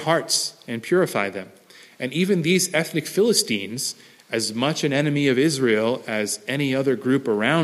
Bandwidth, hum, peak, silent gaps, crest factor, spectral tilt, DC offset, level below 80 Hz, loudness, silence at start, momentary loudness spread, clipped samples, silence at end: 15.5 kHz; none; -4 dBFS; none; 18 dB; -4 dB/octave; under 0.1%; -70 dBFS; -22 LUFS; 0 s; 9 LU; under 0.1%; 0 s